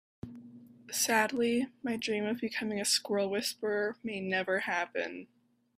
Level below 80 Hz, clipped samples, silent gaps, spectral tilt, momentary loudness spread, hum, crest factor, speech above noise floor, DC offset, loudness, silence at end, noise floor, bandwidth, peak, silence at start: -74 dBFS; under 0.1%; none; -2.5 dB/octave; 13 LU; none; 20 dB; 21 dB; under 0.1%; -32 LUFS; 0.55 s; -53 dBFS; 15.5 kHz; -14 dBFS; 0.25 s